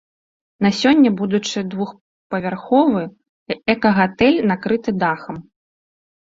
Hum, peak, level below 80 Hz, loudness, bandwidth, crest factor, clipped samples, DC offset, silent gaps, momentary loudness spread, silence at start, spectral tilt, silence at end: none; -2 dBFS; -54 dBFS; -18 LUFS; 7.8 kHz; 18 dB; under 0.1%; under 0.1%; 2.01-2.30 s, 3.29-3.46 s; 13 LU; 0.6 s; -6 dB/octave; 1 s